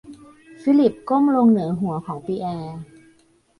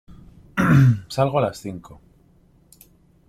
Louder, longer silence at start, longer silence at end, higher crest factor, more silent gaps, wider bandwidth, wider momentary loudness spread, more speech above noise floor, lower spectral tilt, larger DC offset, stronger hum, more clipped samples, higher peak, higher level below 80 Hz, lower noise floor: about the same, -20 LUFS vs -19 LUFS; second, 0.05 s vs 0.55 s; second, 0.75 s vs 1.5 s; about the same, 16 dB vs 18 dB; neither; second, 11 kHz vs 14.5 kHz; second, 14 LU vs 19 LU; about the same, 39 dB vs 37 dB; first, -9 dB/octave vs -7.5 dB/octave; neither; neither; neither; about the same, -6 dBFS vs -4 dBFS; second, -60 dBFS vs -50 dBFS; about the same, -58 dBFS vs -56 dBFS